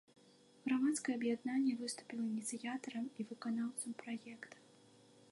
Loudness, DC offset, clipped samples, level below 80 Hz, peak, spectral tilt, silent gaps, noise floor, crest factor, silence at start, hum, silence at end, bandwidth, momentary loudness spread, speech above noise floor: -40 LUFS; under 0.1%; under 0.1%; under -90 dBFS; -26 dBFS; -3.5 dB/octave; none; -66 dBFS; 16 dB; 0.65 s; none; 0.7 s; 11.5 kHz; 11 LU; 26 dB